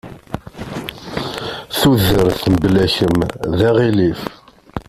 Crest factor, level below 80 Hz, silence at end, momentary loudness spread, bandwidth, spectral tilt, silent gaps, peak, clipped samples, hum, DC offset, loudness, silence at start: 16 dB; -38 dBFS; 0.05 s; 17 LU; 16 kHz; -6 dB/octave; none; 0 dBFS; under 0.1%; none; under 0.1%; -16 LUFS; 0.05 s